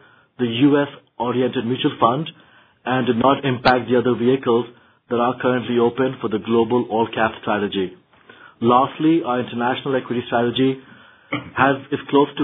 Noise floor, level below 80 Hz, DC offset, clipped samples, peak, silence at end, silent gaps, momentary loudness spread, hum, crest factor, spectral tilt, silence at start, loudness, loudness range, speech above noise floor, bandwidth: -47 dBFS; -56 dBFS; under 0.1%; under 0.1%; 0 dBFS; 0 s; none; 9 LU; none; 18 dB; -9 dB/octave; 0.4 s; -20 LUFS; 2 LU; 28 dB; 5 kHz